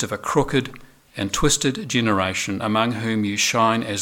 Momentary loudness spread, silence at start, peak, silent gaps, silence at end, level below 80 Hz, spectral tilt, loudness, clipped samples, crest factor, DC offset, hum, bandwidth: 7 LU; 0 s; -4 dBFS; none; 0 s; -40 dBFS; -3.5 dB/octave; -21 LUFS; under 0.1%; 18 dB; under 0.1%; none; 18 kHz